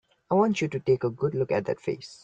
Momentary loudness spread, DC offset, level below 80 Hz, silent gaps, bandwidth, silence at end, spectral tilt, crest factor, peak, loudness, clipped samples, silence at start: 7 LU; under 0.1%; -64 dBFS; none; 8.8 kHz; 0.1 s; -7 dB/octave; 16 dB; -12 dBFS; -27 LUFS; under 0.1%; 0.3 s